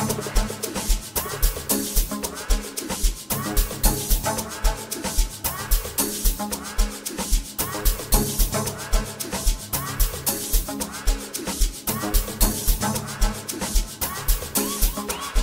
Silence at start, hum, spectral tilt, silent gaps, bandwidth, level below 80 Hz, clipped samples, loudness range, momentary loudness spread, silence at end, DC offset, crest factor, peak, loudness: 0 s; none; -3 dB/octave; none; 16.5 kHz; -26 dBFS; under 0.1%; 1 LU; 6 LU; 0 s; under 0.1%; 22 dB; -2 dBFS; -25 LUFS